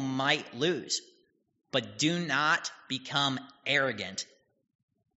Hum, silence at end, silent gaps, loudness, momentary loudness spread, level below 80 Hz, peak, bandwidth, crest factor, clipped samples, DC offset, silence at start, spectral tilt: none; 0.95 s; none; -30 LUFS; 9 LU; -74 dBFS; -10 dBFS; 8 kHz; 22 dB; under 0.1%; under 0.1%; 0 s; -2 dB/octave